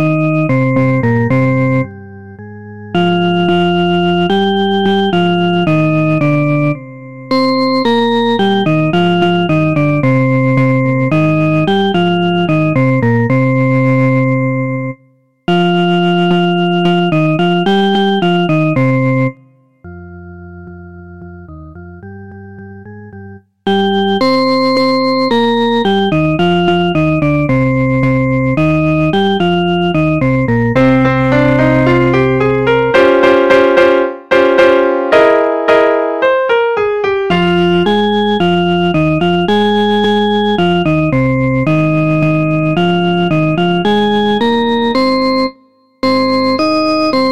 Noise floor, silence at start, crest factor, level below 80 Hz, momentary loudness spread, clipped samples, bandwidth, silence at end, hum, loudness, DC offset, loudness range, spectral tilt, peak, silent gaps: -51 dBFS; 0 s; 12 dB; -42 dBFS; 8 LU; under 0.1%; 9.8 kHz; 0 s; none; -12 LUFS; 2%; 5 LU; -7.5 dB/octave; 0 dBFS; none